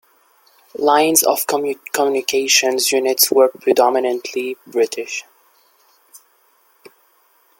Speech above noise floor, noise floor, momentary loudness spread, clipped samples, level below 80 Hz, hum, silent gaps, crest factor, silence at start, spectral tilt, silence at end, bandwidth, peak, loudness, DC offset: 41 dB; -57 dBFS; 12 LU; under 0.1%; -68 dBFS; none; none; 18 dB; 0.8 s; -1 dB/octave; 1.45 s; 17 kHz; 0 dBFS; -16 LUFS; under 0.1%